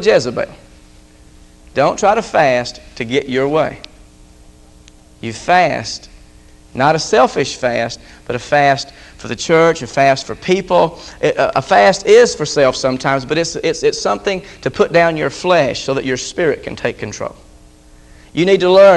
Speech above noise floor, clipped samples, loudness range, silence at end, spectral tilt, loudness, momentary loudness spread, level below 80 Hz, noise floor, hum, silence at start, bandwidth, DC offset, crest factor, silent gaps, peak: 29 dB; under 0.1%; 6 LU; 0 s; -4.5 dB/octave; -15 LUFS; 14 LU; -44 dBFS; -43 dBFS; none; 0 s; 11.5 kHz; under 0.1%; 16 dB; none; 0 dBFS